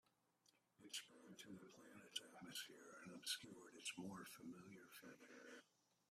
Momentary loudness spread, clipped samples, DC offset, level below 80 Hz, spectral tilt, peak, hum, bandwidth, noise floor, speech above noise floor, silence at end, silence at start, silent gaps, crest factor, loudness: 13 LU; under 0.1%; under 0.1%; under -90 dBFS; -2 dB/octave; -34 dBFS; none; 15.5 kHz; -82 dBFS; 25 dB; 0.45 s; 0.45 s; none; 26 dB; -55 LUFS